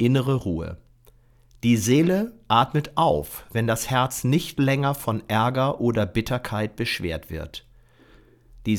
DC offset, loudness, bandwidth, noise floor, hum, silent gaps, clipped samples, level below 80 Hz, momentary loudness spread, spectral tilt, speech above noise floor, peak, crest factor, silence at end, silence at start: under 0.1%; -23 LUFS; 19 kHz; -55 dBFS; none; none; under 0.1%; -48 dBFS; 12 LU; -5.5 dB/octave; 32 dB; -6 dBFS; 18 dB; 0 s; 0 s